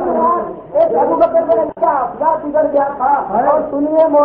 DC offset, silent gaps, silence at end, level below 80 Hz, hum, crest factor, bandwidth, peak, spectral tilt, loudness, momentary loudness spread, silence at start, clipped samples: under 0.1%; none; 0 s; -48 dBFS; none; 12 dB; 4.2 kHz; 0 dBFS; -10.5 dB/octave; -14 LUFS; 3 LU; 0 s; under 0.1%